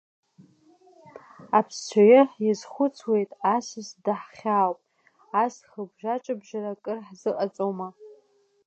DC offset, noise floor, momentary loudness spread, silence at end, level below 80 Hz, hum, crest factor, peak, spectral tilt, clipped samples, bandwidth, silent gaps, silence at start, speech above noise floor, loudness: under 0.1%; -63 dBFS; 16 LU; 0.6 s; -82 dBFS; none; 20 dB; -6 dBFS; -5.5 dB/octave; under 0.1%; 8.4 kHz; none; 1.4 s; 39 dB; -25 LUFS